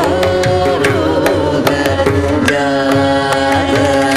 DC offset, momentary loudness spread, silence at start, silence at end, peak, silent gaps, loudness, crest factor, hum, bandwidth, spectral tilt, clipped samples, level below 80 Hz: under 0.1%; 1 LU; 0 s; 0 s; 0 dBFS; none; -13 LUFS; 12 dB; none; 15.5 kHz; -5.5 dB/octave; under 0.1%; -38 dBFS